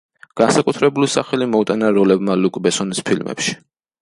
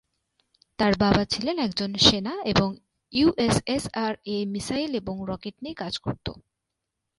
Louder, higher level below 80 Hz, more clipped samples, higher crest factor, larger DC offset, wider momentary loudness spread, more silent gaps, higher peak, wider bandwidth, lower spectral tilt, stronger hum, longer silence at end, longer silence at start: first, -17 LUFS vs -25 LUFS; second, -58 dBFS vs -48 dBFS; neither; second, 16 dB vs 24 dB; neither; second, 7 LU vs 15 LU; neither; about the same, -2 dBFS vs -2 dBFS; about the same, 11.5 kHz vs 11.5 kHz; about the same, -4.5 dB/octave vs -4.5 dB/octave; neither; second, 0.45 s vs 0.8 s; second, 0.35 s vs 0.8 s